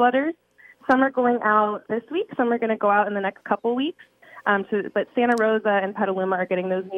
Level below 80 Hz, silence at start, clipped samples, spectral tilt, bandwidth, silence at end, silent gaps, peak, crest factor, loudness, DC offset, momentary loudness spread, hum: -72 dBFS; 0 s; under 0.1%; -6.5 dB/octave; 9.8 kHz; 0 s; none; -4 dBFS; 18 dB; -23 LUFS; under 0.1%; 8 LU; none